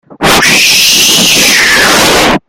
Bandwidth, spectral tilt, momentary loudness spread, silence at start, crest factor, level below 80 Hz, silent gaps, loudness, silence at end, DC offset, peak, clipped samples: over 20 kHz; -1 dB/octave; 3 LU; 0.1 s; 6 dB; -32 dBFS; none; -3 LUFS; 0.1 s; under 0.1%; 0 dBFS; 2%